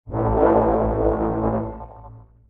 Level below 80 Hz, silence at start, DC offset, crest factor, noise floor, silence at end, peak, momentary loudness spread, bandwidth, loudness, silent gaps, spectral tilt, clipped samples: -32 dBFS; 0.05 s; under 0.1%; 16 dB; -43 dBFS; 0.3 s; -4 dBFS; 17 LU; 3.7 kHz; -20 LUFS; none; -12 dB/octave; under 0.1%